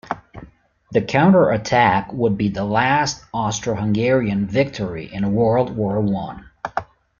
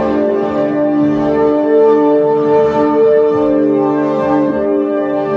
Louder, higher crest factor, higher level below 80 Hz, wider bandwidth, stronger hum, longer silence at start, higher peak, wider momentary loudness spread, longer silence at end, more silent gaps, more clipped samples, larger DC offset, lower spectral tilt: second, -19 LUFS vs -12 LUFS; first, 18 dB vs 10 dB; about the same, -48 dBFS vs -46 dBFS; first, 7.2 kHz vs 6.2 kHz; neither; about the same, 0.05 s vs 0 s; about the same, 0 dBFS vs -2 dBFS; first, 13 LU vs 5 LU; first, 0.35 s vs 0 s; neither; neither; neither; second, -6 dB/octave vs -8.5 dB/octave